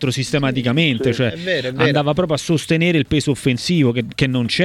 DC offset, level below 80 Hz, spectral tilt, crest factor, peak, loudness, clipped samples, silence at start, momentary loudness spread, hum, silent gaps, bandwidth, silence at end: under 0.1%; -44 dBFS; -5.5 dB/octave; 16 dB; 0 dBFS; -18 LUFS; under 0.1%; 0 s; 3 LU; none; none; 14 kHz; 0 s